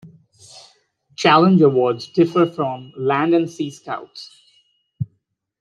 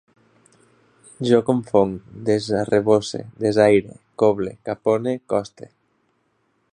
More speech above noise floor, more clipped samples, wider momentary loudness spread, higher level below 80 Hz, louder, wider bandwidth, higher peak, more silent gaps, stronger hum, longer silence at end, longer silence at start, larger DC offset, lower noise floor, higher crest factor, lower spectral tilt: first, 52 dB vs 47 dB; neither; first, 18 LU vs 11 LU; second, -66 dBFS vs -56 dBFS; first, -17 LUFS vs -20 LUFS; second, 9.4 kHz vs 10.5 kHz; about the same, -2 dBFS vs -2 dBFS; neither; neither; second, 0.55 s vs 1.1 s; second, 0.05 s vs 1.2 s; neither; about the same, -69 dBFS vs -67 dBFS; about the same, 18 dB vs 20 dB; about the same, -6.5 dB/octave vs -6.5 dB/octave